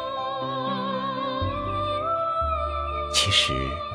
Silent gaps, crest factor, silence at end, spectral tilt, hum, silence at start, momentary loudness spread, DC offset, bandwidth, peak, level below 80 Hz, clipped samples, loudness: none; 20 dB; 0 s; -3.5 dB/octave; none; 0 s; 9 LU; under 0.1%; 11 kHz; -6 dBFS; -38 dBFS; under 0.1%; -25 LUFS